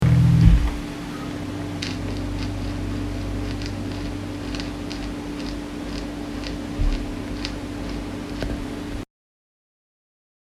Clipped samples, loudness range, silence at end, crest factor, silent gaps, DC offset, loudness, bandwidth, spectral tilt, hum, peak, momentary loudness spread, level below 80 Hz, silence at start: under 0.1%; 6 LU; 1.4 s; 24 dB; none; under 0.1%; -26 LUFS; 13.5 kHz; -6.5 dB/octave; none; 0 dBFS; 11 LU; -30 dBFS; 0 s